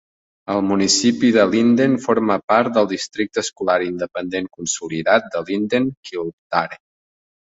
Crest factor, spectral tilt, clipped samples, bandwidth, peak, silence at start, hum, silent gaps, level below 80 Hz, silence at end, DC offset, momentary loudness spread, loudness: 18 dB; -4 dB/octave; under 0.1%; 8 kHz; -2 dBFS; 0.5 s; none; 2.43-2.48 s, 5.97-6.03 s, 6.33-6.50 s; -58 dBFS; 0.7 s; under 0.1%; 10 LU; -19 LUFS